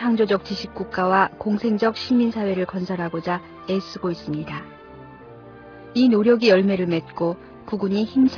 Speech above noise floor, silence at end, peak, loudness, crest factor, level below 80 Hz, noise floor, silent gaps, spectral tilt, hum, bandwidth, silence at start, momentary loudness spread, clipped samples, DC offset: 21 dB; 0 s; -4 dBFS; -22 LUFS; 18 dB; -56 dBFS; -42 dBFS; none; -7 dB/octave; none; 5.4 kHz; 0 s; 17 LU; under 0.1%; under 0.1%